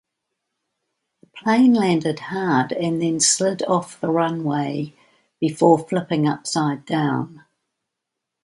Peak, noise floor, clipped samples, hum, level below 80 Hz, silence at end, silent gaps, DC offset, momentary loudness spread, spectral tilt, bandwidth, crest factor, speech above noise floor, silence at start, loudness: -2 dBFS; -82 dBFS; under 0.1%; none; -66 dBFS; 1.05 s; none; under 0.1%; 9 LU; -4.5 dB/octave; 11.5 kHz; 20 dB; 62 dB; 1.35 s; -20 LUFS